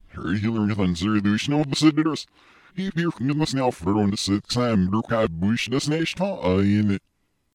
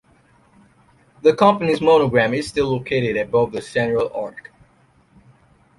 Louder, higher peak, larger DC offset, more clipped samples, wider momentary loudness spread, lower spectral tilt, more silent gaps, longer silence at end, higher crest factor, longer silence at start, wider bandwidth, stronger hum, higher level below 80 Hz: second, -23 LUFS vs -18 LUFS; second, -6 dBFS vs -2 dBFS; neither; neither; about the same, 7 LU vs 8 LU; about the same, -6 dB/octave vs -6 dB/octave; neither; second, 0.55 s vs 1.4 s; about the same, 18 dB vs 18 dB; second, 0.15 s vs 1.25 s; about the same, 12.5 kHz vs 11.5 kHz; neither; about the same, -50 dBFS vs -52 dBFS